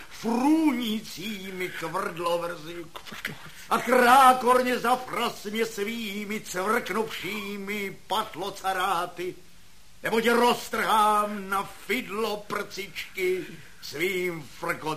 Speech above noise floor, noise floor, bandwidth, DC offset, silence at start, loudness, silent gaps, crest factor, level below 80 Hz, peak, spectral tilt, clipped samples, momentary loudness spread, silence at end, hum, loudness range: 29 dB; -55 dBFS; 15 kHz; 0.5%; 0 s; -26 LUFS; none; 20 dB; -60 dBFS; -6 dBFS; -3.5 dB/octave; under 0.1%; 13 LU; 0 s; none; 7 LU